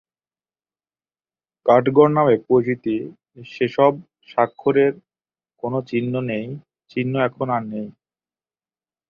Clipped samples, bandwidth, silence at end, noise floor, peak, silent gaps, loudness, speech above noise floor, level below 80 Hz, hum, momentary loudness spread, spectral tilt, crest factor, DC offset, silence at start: under 0.1%; 6.6 kHz; 1.2 s; under -90 dBFS; -2 dBFS; none; -20 LUFS; over 71 dB; -64 dBFS; none; 18 LU; -9 dB/octave; 20 dB; under 0.1%; 1.65 s